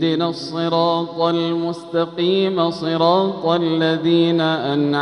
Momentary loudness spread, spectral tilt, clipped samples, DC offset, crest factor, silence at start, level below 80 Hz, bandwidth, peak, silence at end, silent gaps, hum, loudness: 6 LU; -7 dB/octave; under 0.1%; under 0.1%; 16 dB; 0 s; -64 dBFS; 9.8 kHz; -2 dBFS; 0 s; none; none; -18 LUFS